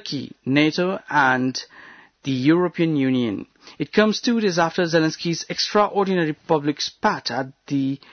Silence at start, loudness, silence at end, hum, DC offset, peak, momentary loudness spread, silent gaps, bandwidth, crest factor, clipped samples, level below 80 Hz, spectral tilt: 0.05 s; -21 LUFS; 0.15 s; none; under 0.1%; -6 dBFS; 10 LU; none; 6.6 kHz; 16 dB; under 0.1%; -64 dBFS; -5 dB/octave